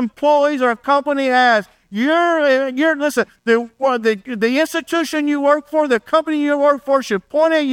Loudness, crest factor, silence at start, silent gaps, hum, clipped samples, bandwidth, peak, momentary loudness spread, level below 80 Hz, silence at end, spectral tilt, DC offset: -16 LUFS; 14 dB; 0 s; none; none; under 0.1%; 17 kHz; -2 dBFS; 5 LU; -64 dBFS; 0 s; -4 dB/octave; under 0.1%